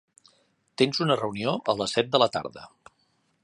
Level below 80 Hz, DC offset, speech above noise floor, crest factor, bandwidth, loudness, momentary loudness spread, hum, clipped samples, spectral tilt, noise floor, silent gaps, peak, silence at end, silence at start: -64 dBFS; under 0.1%; 44 dB; 24 dB; 11.5 kHz; -25 LUFS; 17 LU; none; under 0.1%; -4.5 dB/octave; -70 dBFS; none; -4 dBFS; 0.75 s; 0.8 s